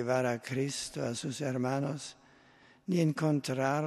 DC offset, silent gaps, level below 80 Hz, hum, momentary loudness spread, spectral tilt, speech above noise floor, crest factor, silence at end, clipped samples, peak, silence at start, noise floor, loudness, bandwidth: under 0.1%; none; -72 dBFS; none; 8 LU; -5.5 dB/octave; 29 dB; 16 dB; 0 s; under 0.1%; -16 dBFS; 0 s; -61 dBFS; -33 LUFS; 13 kHz